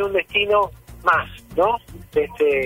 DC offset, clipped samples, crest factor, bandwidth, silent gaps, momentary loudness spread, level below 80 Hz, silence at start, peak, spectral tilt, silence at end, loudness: under 0.1%; under 0.1%; 16 dB; 16 kHz; none; 8 LU; -46 dBFS; 0 s; -4 dBFS; -5 dB/octave; 0 s; -21 LUFS